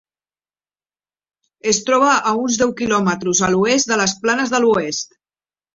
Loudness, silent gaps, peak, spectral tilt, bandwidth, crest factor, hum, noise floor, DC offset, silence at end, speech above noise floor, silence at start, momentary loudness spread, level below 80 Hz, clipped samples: -17 LUFS; none; -2 dBFS; -3 dB/octave; 7.8 kHz; 16 dB; 50 Hz at -65 dBFS; under -90 dBFS; under 0.1%; 0.7 s; over 73 dB; 1.65 s; 6 LU; -54 dBFS; under 0.1%